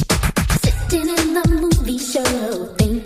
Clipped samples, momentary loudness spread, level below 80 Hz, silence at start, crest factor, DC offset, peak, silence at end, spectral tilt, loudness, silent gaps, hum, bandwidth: under 0.1%; 3 LU; -24 dBFS; 0 s; 16 dB; under 0.1%; -2 dBFS; 0 s; -5 dB/octave; -18 LUFS; none; none; 15.5 kHz